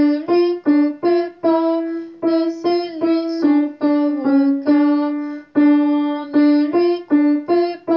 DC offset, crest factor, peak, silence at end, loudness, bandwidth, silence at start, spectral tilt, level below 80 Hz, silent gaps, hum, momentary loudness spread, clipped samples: under 0.1%; 12 dB; -6 dBFS; 0 s; -17 LUFS; 5.8 kHz; 0 s; -7 dB/octave; -70 dBFS; none; none; 5 LU; under 0.1%